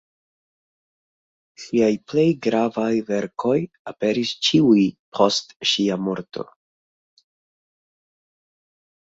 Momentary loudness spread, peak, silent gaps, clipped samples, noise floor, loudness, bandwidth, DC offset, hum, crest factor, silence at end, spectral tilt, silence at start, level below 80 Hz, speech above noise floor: 12 LU; -2 dBFS; 3.79-3.85 s, 4.99-5.12 s, 5.56-5.60 s; under 0.1%; under -90 dBFS; -21 LUFS; 8 kHz; under 0.1%; none; 22 dB; 2.6 s; -5 dB/octave; 1.6 s; -64 dBFS; over 70 dB